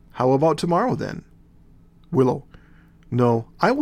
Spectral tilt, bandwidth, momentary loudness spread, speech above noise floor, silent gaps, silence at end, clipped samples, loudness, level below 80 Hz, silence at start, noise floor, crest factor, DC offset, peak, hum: -7.5 dB/octave; 13 kHz; 11 LU; 30 dB; none; 0 s; under 0.1%; -22 LUFS; -52 dBFS; 0.15 s; -50 dBFS; 20 dB; under 0.1%; -2 dBFS; none